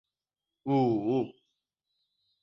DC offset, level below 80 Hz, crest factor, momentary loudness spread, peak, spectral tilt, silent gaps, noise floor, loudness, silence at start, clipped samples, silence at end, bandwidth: under 0.1%; -72 dBFS; 16 dB; 13 LU; -16 dBFS; -9.5 dB/octave; none; under -90 dBFS; -29 LUFS; 0.65 s; under 0.1%; 1.1 s; 6 kHz